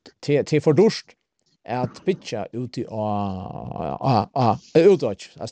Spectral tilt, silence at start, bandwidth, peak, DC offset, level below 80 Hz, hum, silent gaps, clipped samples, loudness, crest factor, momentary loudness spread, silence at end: -7 dB/octave; 0.05 s; 9 kHz; -4 dBFS; under 0.1%; -56 dBFS; none; none; under 0.1%; -22 LUFS; 18 dB; 14 LU; 0 s